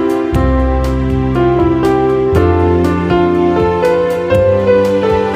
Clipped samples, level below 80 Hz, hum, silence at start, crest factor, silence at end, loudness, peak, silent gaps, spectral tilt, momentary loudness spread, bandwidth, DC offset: under 0.1%; -22 dBFS; none; 0 s; 12 dB; 0 s; -12 LUFS; 0 dBFS; none; -8 dB/octave; 3 LU; 15 kHz; under 0.1%